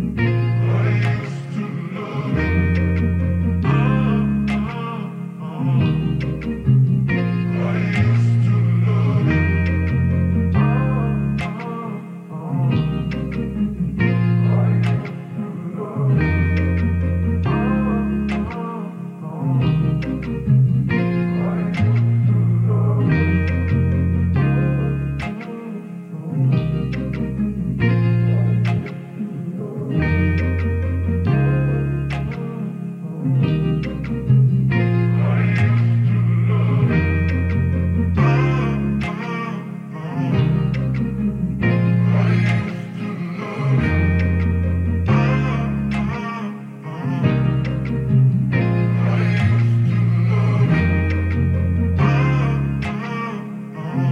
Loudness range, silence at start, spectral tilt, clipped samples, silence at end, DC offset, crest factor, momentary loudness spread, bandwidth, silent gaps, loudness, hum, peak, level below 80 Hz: 3 LU; 0 s; -9 dB/octave; under 0.1%; 0 s; under 0.1%; 14 dB; 10 LU; 6.4 kHz; none; -19 LUFS; none; -4 dBFS; -38 dBFS